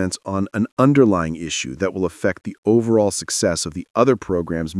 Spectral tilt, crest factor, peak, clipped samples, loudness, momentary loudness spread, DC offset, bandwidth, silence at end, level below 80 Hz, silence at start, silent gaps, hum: -5 dB/octave; 18 dB; -2 dBFS; under 0.1%; -19 LUFS; 8 LU; under 0.1%; 12 kHz; 0 s; -52 dBFS; 0 s; 0.72-0.77 s, 2.58-2.63 s, 3.90-3.94 s; none